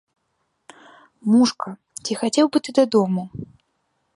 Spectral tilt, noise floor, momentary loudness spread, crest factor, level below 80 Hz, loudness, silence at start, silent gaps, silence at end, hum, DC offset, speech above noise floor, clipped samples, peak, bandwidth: -5 dB/octave; -72 dBFS; 15 LU; 18 dB; -62 dBFS; -20 LUFS; 1.25 s; none; 0.7 s; none; under 0.1%; 53 dB; under 0.1%; -4 dBFS; 11.5 kHz